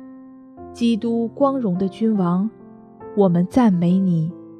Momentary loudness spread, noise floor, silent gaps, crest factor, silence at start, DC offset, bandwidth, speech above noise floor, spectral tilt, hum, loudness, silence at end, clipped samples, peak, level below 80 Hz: 7 LU; -41 dBFS; none; 16 dB; 0 s; under 0.1%; 9.6 kHz; 23 dB; -9 dB/octave; none; -19 LUFS; 0 s; under 0.1%; -4 dBFS; -58 dBFS